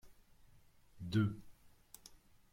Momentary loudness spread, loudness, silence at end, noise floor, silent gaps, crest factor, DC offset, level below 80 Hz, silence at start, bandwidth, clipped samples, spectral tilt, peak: 22 LU; -38 LUFS; 0.35 s; -65 dBFS; none; 20 dB; under 0.1%; -66 dBFS; 0.05 s; 16 kHz; under 0.1%; -7 dB/octave; -24 dBFS